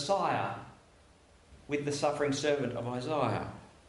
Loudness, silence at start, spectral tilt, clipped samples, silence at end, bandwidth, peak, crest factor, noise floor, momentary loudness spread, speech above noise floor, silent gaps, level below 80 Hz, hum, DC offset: -32 LUFS; 0 s; -5 dB/octave; under 0.1%; 0.2 s; 11.5 kHz; -16 dBFS; 18 dB; -61 dBFS; 10 LU; 29 dB; none; -62 dBFS; none; under 0.1%